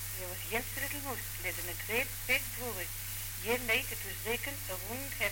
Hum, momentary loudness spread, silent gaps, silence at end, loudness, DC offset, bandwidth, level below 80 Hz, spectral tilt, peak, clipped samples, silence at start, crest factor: none; 7 LU; none; 0 s; -35 LUFS; under 0.1%; 17 kHz; -50 dBFS; -2.5 dB/octave; -18 dBFS; under 0.1%; 0 s; 18 dB